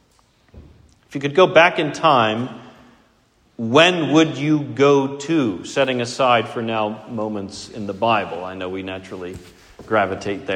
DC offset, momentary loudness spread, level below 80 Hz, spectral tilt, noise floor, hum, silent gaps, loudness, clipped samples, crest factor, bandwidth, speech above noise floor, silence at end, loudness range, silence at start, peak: under 0.1%; 17 LU; -56 dBFS; -5 dB/octave; -58 dBFS; none; none; -18 LUFS; under 0.1%; 20 dB; 10.5 kHz; 40 dB; 0 s; 7 LU; 0.55 s; 0 dBFS